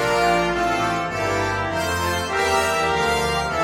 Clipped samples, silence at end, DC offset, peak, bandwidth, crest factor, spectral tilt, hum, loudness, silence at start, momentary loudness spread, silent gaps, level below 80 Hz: under 0.1%; 0 s; under 0.1%; -6 dBFS; 16 kHz; 14 dB; -4 dB/octave; none; -21 LUFS; 0 s; 4 LU; none; -40 dBFS